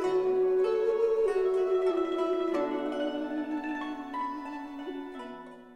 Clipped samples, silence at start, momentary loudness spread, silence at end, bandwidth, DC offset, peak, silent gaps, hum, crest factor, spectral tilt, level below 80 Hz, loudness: under 0.1%; 0 s; 13 LU; 0 s; 9.6 kHz; under 0.1%; -16 dBFS; none; none; 12 dB; -5.5 dB/octave; -64 dBFS; -30 LUFS